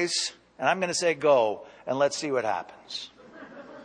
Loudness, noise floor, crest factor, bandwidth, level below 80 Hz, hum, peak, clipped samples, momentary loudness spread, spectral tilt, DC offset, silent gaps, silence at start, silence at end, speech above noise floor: -27 LUFS; -46 dBFS; 20 dB; 10 kHz; -72 dBFS; none; -8 dBFS; under 0.1%; 19 LU; -2.5 dB/octave; under 0.1%; none; 0 s; 0 s; 20 dB